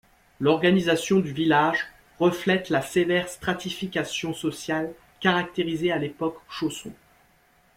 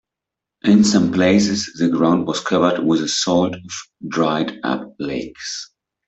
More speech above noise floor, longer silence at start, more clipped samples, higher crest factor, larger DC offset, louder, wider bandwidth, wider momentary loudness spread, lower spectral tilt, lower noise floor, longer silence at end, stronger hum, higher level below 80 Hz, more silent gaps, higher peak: second, 37 dB vs 67 dB; second, 0.4 s vs 0.65 s; neither; about the same, 18 dB vs 16 dB; neither; second, -25 LUFS vs -18 LUFS; first, 16 kHz vs 8.2 kHz; second, 10 LU vs 13 LU; about the same, -5 dB/octave vs -5 dB/octave; second, -61 dBFS vs -85 dBFS; first, 0.85 s vs 0.45 s; neither; about the same, -60 dBFS vs -56 dBFS; neither; second, -6 dBFS vs -2 dBFS